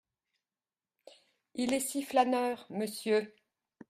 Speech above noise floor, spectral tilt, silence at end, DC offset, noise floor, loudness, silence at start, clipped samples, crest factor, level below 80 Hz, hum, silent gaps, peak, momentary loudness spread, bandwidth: over 59 dB; -3.5 dB/octave; 0.6 s; under 0.1%; under -90 dBFS; -32 LUFS; 1.55 s; under 0.1%; 20 dB; -76 dBFS; none; none; -14 dBFS; 9 LU; 15.5 kHz